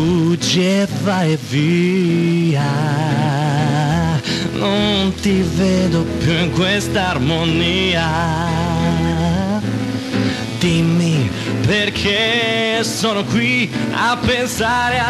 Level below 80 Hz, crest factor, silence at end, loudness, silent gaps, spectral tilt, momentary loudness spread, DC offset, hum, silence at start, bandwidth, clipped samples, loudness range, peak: -38 dBFS; 12 dB; 0 s; -16 LUFS; none; -5.5 dB/octave; 4 LU; under 0.1%; none; 0 s; 13 kHz; under 0.1%; 2 LU; -4 dBFS